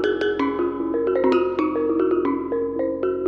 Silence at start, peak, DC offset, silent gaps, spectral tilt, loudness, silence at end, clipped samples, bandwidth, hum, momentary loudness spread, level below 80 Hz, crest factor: 0 s; -8 dBFS; under 0.1%; none; -7 dB/octave; -22 LUFS; 0 s; under 0.1%; 6.6 kHz; none; 5 LU; -54 dBFS; 14 dB